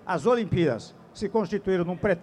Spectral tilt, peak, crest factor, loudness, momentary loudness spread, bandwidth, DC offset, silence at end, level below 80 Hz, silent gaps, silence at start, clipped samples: -7 dB/octave; -10 dBFS; 14 dB; -26 LUFS; 11 LU; 10.5 kHz; under 0.1%; 0 s; -52 dBFS; none; 0.05 s; under 0.1%